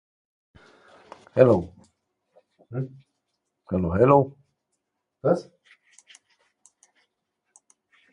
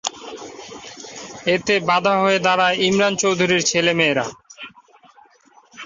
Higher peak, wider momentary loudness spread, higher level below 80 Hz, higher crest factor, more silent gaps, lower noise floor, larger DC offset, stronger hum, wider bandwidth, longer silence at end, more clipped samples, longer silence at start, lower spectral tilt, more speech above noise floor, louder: about the same, -2 dBFS vs -2 dBFS; about the same, 17 LU vs 19 LU; first, -50 dBFS vs -60 dBFS; first, 26 dB vs 20 dB; neither; first, -79 dBFS vs -53 dBFS; neither; neither; first, 10 kHz vs 7.8 kHz; first, 2.7 s vs 0 s; neither; first, 1.35 s vs 0.05 s; first, -9 dB/octave vs -3 dB/octave; first, 59 dB vs 35 dB; second, -23 LUFS vs -17 LUFS